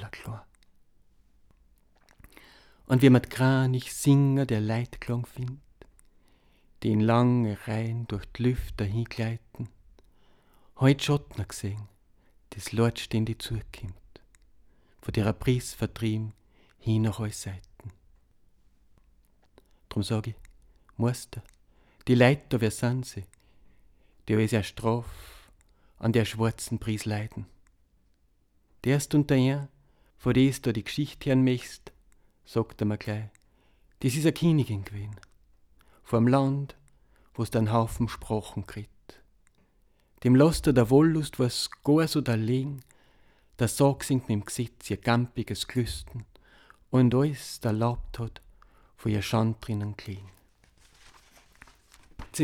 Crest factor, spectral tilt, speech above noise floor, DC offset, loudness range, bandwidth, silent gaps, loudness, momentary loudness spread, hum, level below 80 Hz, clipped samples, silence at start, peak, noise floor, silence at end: 22 dB; -6.5 dB/octave; 40 dB; under 0.1%; 8 LU; 16.5 kHz; none; -27 LUFS; 19 LU; none; -50 dBFS; under 0.1%; 0 s; -6 dBFS; -66 dBFS; 0 s